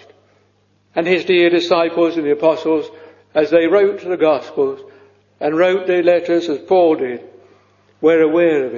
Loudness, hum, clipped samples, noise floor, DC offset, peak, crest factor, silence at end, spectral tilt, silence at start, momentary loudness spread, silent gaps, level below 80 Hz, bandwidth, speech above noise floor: -16 LUFS; 50 Hz at -55 dBFS; under 0.1%; -58 dBFS; under 0.1%; 0 dBFS; 16 dB; 0 s; -6 dB/octave; 0.95 s; 8 LU; none; -62 dBFS; 7.2 kHz; 43 dB